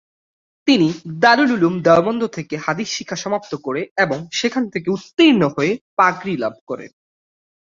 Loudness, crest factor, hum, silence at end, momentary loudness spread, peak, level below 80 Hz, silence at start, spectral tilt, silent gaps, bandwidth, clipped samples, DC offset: -18 LUFS; 18 dB; none; 0.8 s; 11 LU; -2 dBFS; -60 dBFS; 0.65 s; -5 dB/octave; 3.91-3.96 s, 5.81-5.97 s, 6.61-6.67 s; 7.6 kHz; under 0.1%; under 0.1%